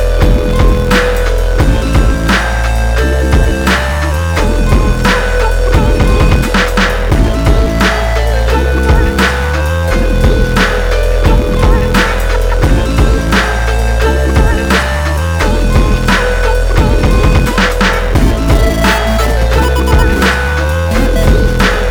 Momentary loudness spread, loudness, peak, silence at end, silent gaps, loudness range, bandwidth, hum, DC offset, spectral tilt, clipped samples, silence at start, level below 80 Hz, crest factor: 3 LU; -11 LUFS; 0 dBFS; 0 s; none; 1 LU; 18.5 kHz; none; under 0.1%; -5.5 dB/octave; under 0.1%; 0 s; -12 dBFS; 10 dB